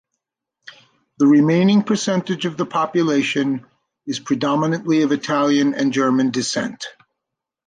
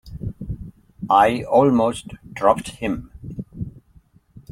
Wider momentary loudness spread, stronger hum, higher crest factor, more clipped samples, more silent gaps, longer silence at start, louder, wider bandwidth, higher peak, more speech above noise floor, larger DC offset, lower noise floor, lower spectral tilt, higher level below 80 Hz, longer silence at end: second, 13 LU vs 19 LU; neither; second, 14 dB vs 20 dB; neither; neither; first, 1.2 s vs 0.05 s; about the same, -18 LUFS vs -19 LUFS; second, 9.6 kHz vs 15 kHz; second, -6 dBFS vs -2 dBFS; first, 65 dB vs 36 dB; neither; first, -83 dBFS vs -54 dBFS; about the same, -5.5 dB/octave vs -6.5 dB/octave; second, -66 dBFS vs -44 dBFS; first, 0.75 s vs 0.1 s